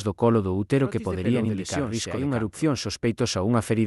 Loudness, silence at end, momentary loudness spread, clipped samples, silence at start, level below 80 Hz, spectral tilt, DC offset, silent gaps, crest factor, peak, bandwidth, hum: -25 LUFS; 0 s; 5 LU; under 0.1%; 0 s; -54 dBFS; -6 dB/octave; under 0.1%; none; 16 dB; -8 dBFS; 12 kHz; none